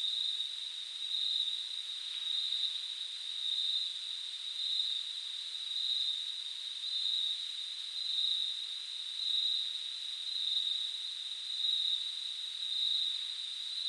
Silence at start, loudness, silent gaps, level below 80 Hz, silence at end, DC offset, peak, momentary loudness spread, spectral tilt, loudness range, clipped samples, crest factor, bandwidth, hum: 0 s; -34 LUFS; none; under -90 dBFS; 0 s; under 0.1%; -20 dBFS; 7 LU; 5.5 dB/octave; 2 LU; under 0.1%; 16 dB; 12.5 kHz; none